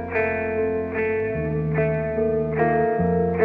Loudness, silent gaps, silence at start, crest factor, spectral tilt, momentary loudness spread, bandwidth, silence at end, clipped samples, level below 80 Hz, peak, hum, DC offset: -23 LUFS; none; 0 s; 16 dB; -11 dB/octave; 4 LU; 4 kHz; 0 s; under 0.1%; -42 dBFS; -6 dBFS; none; under 0.1%